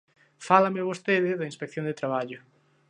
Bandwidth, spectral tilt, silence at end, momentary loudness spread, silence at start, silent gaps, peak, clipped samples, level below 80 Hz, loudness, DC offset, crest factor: 10.5 kHz; -6 dB/octave; 0.5 s; 16 LU; 0.4 s; none; -4 dBFS; under 0.1%; -76 dBFS; -26 LUFS; under 0.1%; 24 dB